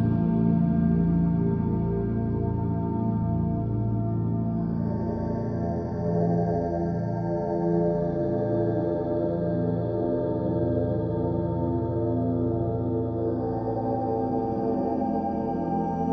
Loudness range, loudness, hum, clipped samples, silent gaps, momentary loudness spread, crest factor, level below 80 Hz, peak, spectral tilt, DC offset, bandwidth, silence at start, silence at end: 2 LU; -26 LUFS; none; under 0.1%; none; 5 LU; 14 dB; -44 dBFS; -12 dBFS; -12 dB/octave; under 0.1%; 5 kHz; 0 s; 0 s